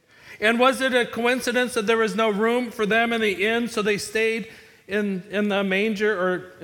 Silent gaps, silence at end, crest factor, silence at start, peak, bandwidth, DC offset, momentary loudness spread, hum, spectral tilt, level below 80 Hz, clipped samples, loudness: none; 0 s; 18 dB; 0.25 s; -6 dBFS; 18 kHz; under 0.1%; 7 LU; none; -4 dB/octave; -62 dBFS; under 0.1%; -22 LUFS